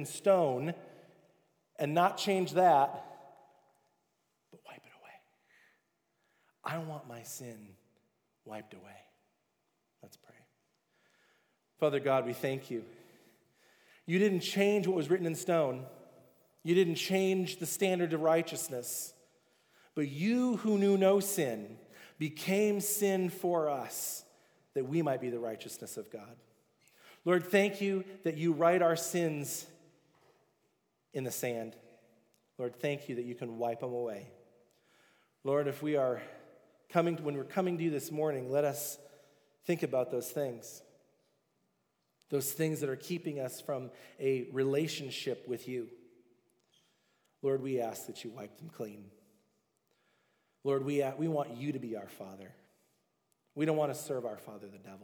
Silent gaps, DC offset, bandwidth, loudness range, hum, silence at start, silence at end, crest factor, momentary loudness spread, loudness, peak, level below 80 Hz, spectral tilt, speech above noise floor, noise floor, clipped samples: none; under 0.1%; over 20 kHz; 10 LU; none; 0 s; 0 s; 22 dB; 19 LU; -33 LUFS; -14 dBFS; under -90 dBFS; -5 dB/octave; 47 dB; -80 dBFS; under 0.1%